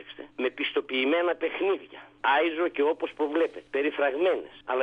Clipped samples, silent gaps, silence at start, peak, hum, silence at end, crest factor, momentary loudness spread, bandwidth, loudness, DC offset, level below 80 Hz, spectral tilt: under 0.1%; none; 0 s; -12 dBFS; none; 0 s; 14 dB; 8 LU; 5 kHz; -27 LUFS; under 0.1%; -70 dBFS; -5 dB/octave